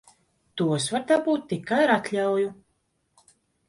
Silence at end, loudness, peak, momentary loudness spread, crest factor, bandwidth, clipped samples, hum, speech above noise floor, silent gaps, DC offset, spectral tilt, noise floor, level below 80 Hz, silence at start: 1.15 s; -24 LUFS; -8 dBFS; 7 LU; 18 dB; 11.5 kHz; under 0.1%; none; 48 dB; none; under 0.1%; -5 dB/octave; -72 dBFS; -68 dBFS; 0.55 s